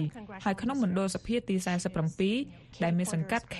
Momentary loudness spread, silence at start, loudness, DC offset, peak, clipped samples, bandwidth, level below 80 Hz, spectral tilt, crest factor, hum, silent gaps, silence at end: 5 LU; 0 s; -31 LUFS; under 0.1%; -14 dBFS; under 0.1%; 13 kHz; -56 dBFS; -5.5 dB/octave; 18 dB; none; none; 0 s